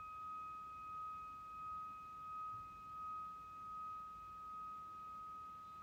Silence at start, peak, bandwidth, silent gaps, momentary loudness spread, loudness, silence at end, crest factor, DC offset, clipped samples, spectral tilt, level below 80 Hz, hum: 0 s; -42 dBFS; 16.5 kHz; none; 4 LU; -50 LUFS; 0 s; 8 dB; under 0.1%; under 0.1%; -4.5 dB/octave; -74 dBFS; none